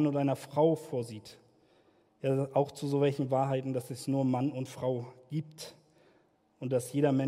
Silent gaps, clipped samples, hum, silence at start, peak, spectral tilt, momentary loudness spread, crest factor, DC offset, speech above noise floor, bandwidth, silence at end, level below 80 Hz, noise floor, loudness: none; under 0.1%; none; 0 s; -14 dBFS; -7.5 dB/octave; 12 LU; 18 dB; under 0.1%; 37 dB; 15.5 kHz; 0 s; -76 dBFS; -68 dBFS; -32 LUFS